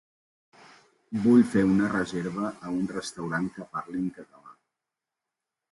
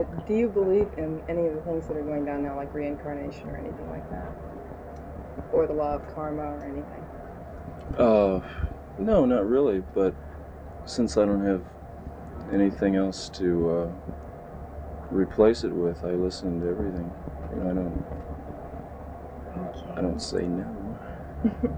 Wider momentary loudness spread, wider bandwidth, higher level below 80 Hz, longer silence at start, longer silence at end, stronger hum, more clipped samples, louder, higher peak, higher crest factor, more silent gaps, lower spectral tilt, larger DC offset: second, 14 LU vs 18 LU; first, 11.5 kHz vs 10 kHz; second, -60 dBFS vs -42 dBFS; first, 1.1 s vs 0 s; first, 1.2 s vs 0 s; neither; neither; about the same, -27 LUFS vs -27 LUFS; about the same, -8 dBFS vs -6 dBFS; about the same, 20 dB vs 22 dB; neither; about the same, -6.5 dB/octave vs -7 dB/octave; neither